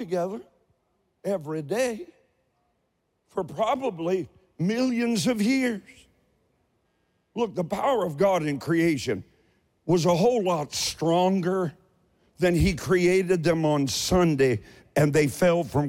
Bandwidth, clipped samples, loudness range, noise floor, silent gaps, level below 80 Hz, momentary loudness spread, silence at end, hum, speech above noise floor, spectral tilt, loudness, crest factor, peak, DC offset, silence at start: 16.5 kHz; under 0.1%; 7 LU; -74 dBFS; none; -48 dBFS; 11 LU; 0 s; none; 50 dB; -5.5 dB/octave; -25 LUFS; 14 dB; -12 dBFS; under 0.1%; 0 s